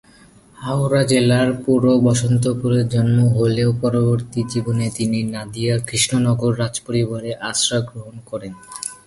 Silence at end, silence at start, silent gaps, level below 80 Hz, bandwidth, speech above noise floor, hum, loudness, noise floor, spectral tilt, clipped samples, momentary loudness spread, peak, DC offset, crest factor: 0.1 s; 0.6 s; none; -48 dBFS; 11.5 kHz; 30 dB; none; -18 LUFS; -48 dBFS; -5.5 dB/octave; under 0.1%; 14 LU; -2 dBFS; under 0.1%; 16 dB